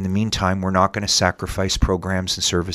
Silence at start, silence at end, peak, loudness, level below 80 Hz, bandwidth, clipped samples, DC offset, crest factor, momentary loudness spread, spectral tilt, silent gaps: 0 s; 0 s; 0 dBFS; -20 LUFS; -32 dBFS; 15.5 kHz; under 0.1%; under 0.1%; 20 dB; 5 LU; -4 dB/octave; none